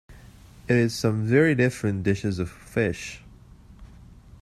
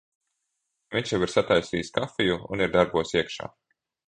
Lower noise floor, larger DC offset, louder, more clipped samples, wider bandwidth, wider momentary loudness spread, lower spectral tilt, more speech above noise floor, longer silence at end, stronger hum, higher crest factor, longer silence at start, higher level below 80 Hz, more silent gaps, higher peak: second, -49 dBFS vs -80 dBFS; neither; about the same, -24 LUFS vs -26 LUFS; neither; first, 13.5 kHz vs 10 kHz; first, 15 LU vs 9 LU; first, -6.5 dB/octave vs -5 dB/octave; second, 25 dB vs 54 dB; about the same, 0.55 s vs 0.65 s; neither; about the same, 20 dB vs 22 dB; second, 0.1 s vs 0.9 s; about the same, -50 dBFS vs -54 dBFS; neither; about the same, -6 dBFS vs -4 dBFS